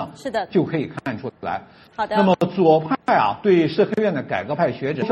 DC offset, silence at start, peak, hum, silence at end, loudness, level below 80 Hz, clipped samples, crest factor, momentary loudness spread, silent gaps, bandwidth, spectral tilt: under 0.1%; 0 s; -2 dBFS; none; 0 s; -20 LUFS; -58 dBFS; under 0.1%; 18 dB; 12 LU; none; 9.6 kHz; -7.5 dB/octave